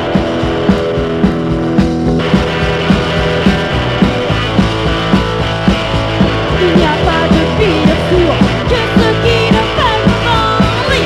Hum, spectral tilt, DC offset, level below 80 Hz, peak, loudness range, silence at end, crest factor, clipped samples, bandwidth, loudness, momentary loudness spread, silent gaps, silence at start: none; -6.5 dB/octave; under 0.1%; -22 dBFS; 0 dBFS; 2 LU; 0 s; 12 dB; 0.3%; 12 kHz; -12 LUFS; 3 LU; none; 0 s